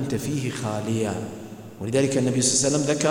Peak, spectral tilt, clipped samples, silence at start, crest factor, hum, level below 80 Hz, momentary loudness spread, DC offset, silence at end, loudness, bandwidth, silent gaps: -6 dBFS; -4 dB/octave; under 0.1%; 0 s; 18 dB; none; -56 dBFS; 16 LU; under 0.1%; 0 s; -23 LUFS; 16.5 kHz; none